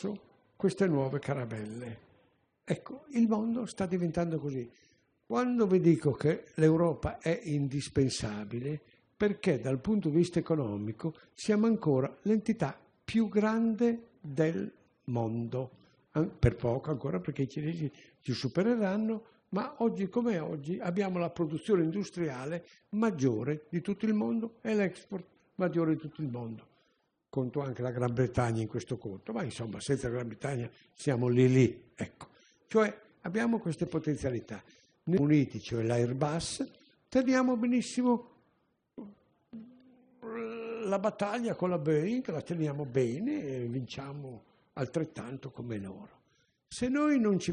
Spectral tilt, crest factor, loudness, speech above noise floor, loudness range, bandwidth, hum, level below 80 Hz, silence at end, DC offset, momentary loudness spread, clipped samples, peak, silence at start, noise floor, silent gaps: -7 dB/octave; 20 dB; -32 LUFS; 44 dB; 5 LU; 10 kHz; none; -60 dBFS; 0 s; under 0.1%; 15 LU; under 0.1%; -12 dBFS; 0 s; -75 dBFS; none